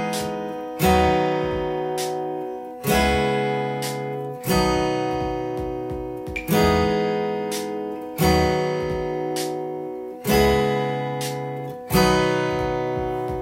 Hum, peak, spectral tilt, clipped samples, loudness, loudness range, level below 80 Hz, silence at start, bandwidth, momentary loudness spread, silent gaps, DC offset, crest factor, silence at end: none; -4 dBFS; -5 dB/octave; under 0.1%; -23 LUFS; 2 LU; -38 dBFS; 0 s; 16.5 kHz; 11 LU; none; under 0.1%; 18 dB; 0 s